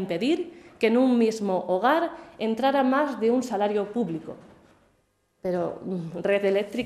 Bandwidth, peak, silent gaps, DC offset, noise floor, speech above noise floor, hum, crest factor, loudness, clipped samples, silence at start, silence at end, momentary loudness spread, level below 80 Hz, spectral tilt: 13.5 kHz; -8 dBFS; none; under 0.1%; -69 dBFS; 44 dB; none; 16 dB; -25 LUFS; under 0.1%; 0 s; 0 s; 11 LU; -68 dBFS; -6 dB/octave